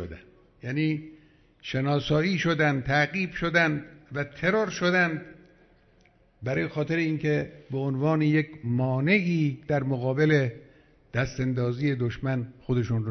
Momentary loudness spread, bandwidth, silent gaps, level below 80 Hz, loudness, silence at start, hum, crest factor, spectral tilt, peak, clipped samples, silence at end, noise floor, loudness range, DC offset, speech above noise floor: 11 LU; 6.4 kHz; none; -54 dBFS; -26 LUFS; 0 s; none; 18 dB; -7 dB/octave; -8 dBFS; under 0.1%; 0 s; -61 dBFS; 3 LU; under 0.1%; 35 dB